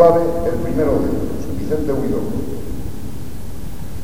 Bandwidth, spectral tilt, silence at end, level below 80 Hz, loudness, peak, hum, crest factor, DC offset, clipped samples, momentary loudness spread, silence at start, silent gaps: 19 kHz; -8 dB/octave; 0 s; -32 dBFS; -21 LUFS; 0 dBFS; none; 20 dB; 8%; under 0.1%; 15 LU; 0 s; none